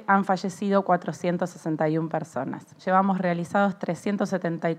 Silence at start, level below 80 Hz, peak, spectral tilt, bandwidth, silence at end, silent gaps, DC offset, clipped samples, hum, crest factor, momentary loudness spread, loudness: 0 s; -76 dBFS; -6 dBFS; -7 dB/octave; 12.5 kHz; 0 s; none; under 0.1%; under 0.1%; none; 18 dB; 8 LU; -26 LUFS